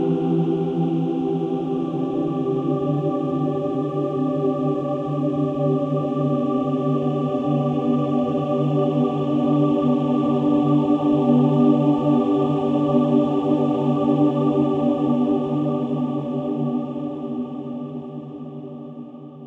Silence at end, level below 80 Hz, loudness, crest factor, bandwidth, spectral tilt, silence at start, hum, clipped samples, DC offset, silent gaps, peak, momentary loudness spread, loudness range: 0 s; -60 dBFS; -21 LUFS; 16 dB; 5.6 kHz; -10 dB/octave; 0 s; none; under 0.1%; under 0.1%; none; -6 dBFS; 10 LU; 5 LU